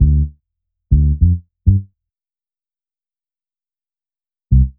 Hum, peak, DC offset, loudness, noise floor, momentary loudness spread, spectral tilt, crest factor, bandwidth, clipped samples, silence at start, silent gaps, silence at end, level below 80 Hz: none; 0 dBFS; under 0.1%; -17 LUFS; under -90 dBFS; 5 LU; -24 dB/octave; 18 dB; 0.5 kHz; under 0.1%; 0 s; none; 0.1 s; -20 dBFS